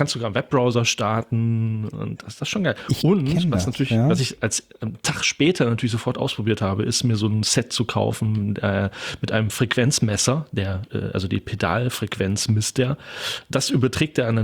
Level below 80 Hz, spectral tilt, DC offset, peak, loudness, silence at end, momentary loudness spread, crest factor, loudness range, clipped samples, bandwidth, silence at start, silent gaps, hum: -52 dBFS; -5 dB/octave; under 0.1%; -6 dBFS; -22 LUFS; 0 s; 8 LU; 16 dB; 2 LU; under 0.1%; 19.5 kHz; 0 s; none; none